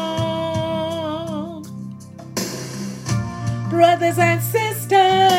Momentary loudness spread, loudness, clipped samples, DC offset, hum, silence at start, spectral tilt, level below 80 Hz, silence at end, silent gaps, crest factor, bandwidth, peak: 17 LU; -20 LUFS; under 0.1%; under 0.1%; none; 0 s; -5 dB/octave; -52 dBFS; 0 s; none; 18 dB; 16.5 kHz; -2 dBFS